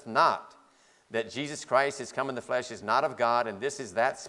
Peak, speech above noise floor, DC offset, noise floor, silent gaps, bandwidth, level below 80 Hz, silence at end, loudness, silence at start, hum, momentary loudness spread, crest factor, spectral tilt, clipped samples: -8 dBFS; 33 dB; under 0.1%; -62 dBFS; none; 11.5 kHz; -76 dBFS; 0 s; -29 LUFS; 0.05 s; none; 9 LU; 22 dB; -3.5 dB/octave; under 0.1%